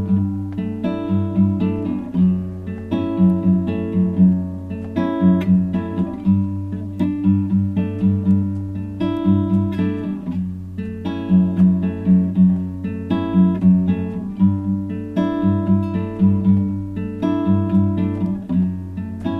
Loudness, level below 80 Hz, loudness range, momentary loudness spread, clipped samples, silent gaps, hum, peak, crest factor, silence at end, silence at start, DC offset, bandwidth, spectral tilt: -19 LUFS; -46 dBFS; 3 LU; 10 LU; under 0.1%; none; none; -4 dBFS; 14 dB; 0 s; 0 s; under 0.1%; 4 kHz; -10.5 dB/octave